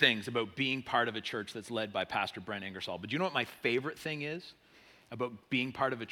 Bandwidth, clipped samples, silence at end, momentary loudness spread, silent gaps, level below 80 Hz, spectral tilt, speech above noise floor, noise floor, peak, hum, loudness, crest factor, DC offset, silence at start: 17.5 kHz; under 0.1%; 0 s; 9 LU; none; -74 dBFS; -4.5 dB/octave; 26 dB; -61 dBFS; -10 dBFS; none; -35 LUFS; 24 dB; under 0.1%; 0 s